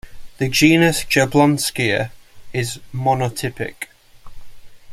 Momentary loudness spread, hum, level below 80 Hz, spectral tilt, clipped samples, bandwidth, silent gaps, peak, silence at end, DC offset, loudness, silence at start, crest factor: 15 LU; none; -44 dBFS; -4.5 dB/octave; under 0.1%; 16 kHz; none; -2 dBFS; 0 s; under 0.1%; -18 LUFS; 0.05 s; 18 dB